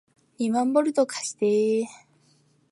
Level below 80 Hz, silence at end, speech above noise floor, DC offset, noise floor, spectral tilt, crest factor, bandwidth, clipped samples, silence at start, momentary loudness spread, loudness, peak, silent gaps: -80 dBFS; 0.75 s; 39 dB; under 0.1%; -63 dBFS; -4.5 dB/octave; 18 dB; 11.5 kHz; under 0.1%; 0.4 s; 7 LU; -24 LUFS; -8 dBFS; none